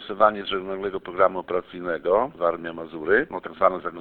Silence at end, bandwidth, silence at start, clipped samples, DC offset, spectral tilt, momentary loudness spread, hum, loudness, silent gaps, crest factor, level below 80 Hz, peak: 0 s; 4.4 kHz; 0 s; under 0.1%; under 0.1%; -8 dB/octave; 10 LU; none; -24 LUFS; none; 22 dB; -56 dBFS; -2 dBFS